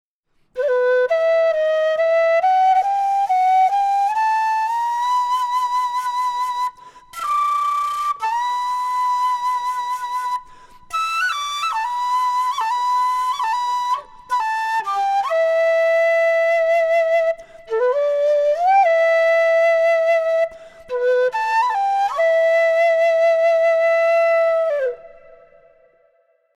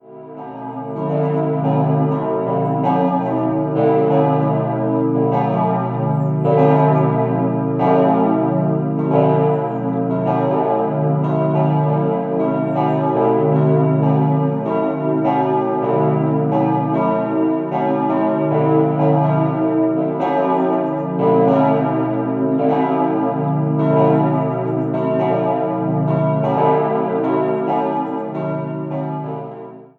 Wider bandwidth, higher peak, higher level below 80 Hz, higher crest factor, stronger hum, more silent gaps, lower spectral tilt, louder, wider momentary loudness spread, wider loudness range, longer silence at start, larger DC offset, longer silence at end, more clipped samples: first, 14 kHz vs 4.1 kHz; second, -8 dBFS vs -2 dBFS; about the same, -62 dBFS vs -60 dBFS; second, 10 dB vs 16 dB; neither; neither; second, 0.5 dB/octave vs -11 dB/octave; about the same, -18 LUFS vs -17 LUFS; about the same, 8 LU vs 6 LU; first, 5 LU vs 2 LU; first, 0.55 s vs 0.05 s; neither; first, 1.5 s vs 0.15 s; neither